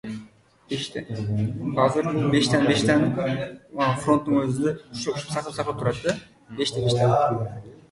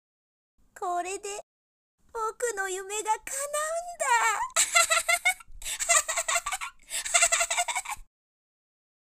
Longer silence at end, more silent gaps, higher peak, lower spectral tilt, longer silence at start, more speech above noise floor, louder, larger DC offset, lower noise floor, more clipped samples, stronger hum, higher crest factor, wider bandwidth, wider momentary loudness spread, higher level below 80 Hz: second, 0.2 s vs 1 s; second, none vs 1.43-1.98 s; about the same, -6 dBFS vs -6 dBFS; first, -6 dB/octave vs 2 dB/octave; second, 0.05 s vs 0.75 s; second, 27 dB vs over 61 dB; about the same, -24 LUFS vs -26 LUFS; neither; second, -50 dBFS vs under -90 dBFS; neither; neither; second, 18 dB vs 24 dB; second, 11.5 kHz vs 16 kHz; about the same, 12 LU vs 14 LU; about the same, -54 dBFS vs -58 dBFS